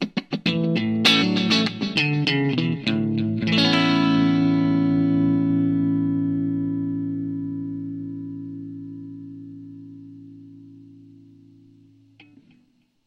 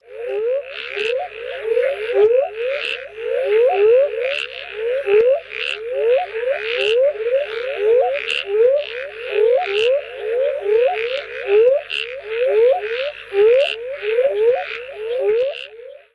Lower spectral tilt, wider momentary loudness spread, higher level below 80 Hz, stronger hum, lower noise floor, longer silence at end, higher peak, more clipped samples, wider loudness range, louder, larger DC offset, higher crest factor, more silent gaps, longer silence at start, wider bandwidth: first, -6 dB/octave vs -3 dB/octave; first, 20 LU vs 10 LU; about the same, -60 dBFS vs -60 dBFS; second, none vs 50 Hz at -60 dBFS; first, -62 dBFS vs -38 dBFS; first, 2.15 s vs 0.2 s; about the same, -6 dBFS vs -6 dBFS; neither; first, 18 LU vs 1 LU; second, -21 LUFS vs -18 LUFS; neither; first, 18 dB vs 12 dB; neither; about the same, 0 s vs 0.1 s; about the same, 11.5 kHz vs 11.5 kHz